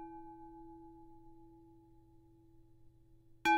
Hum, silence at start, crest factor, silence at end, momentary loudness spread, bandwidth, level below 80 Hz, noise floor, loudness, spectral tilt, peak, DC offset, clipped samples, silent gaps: none; 0 s; 24 dB; 0 s; 16 LU; 14 kHz; -66 dBFS; -63 dBFS; -48 LUFS; -3.5 dB/octave; -20 dBFS; under 0.1%; under 0.1%; none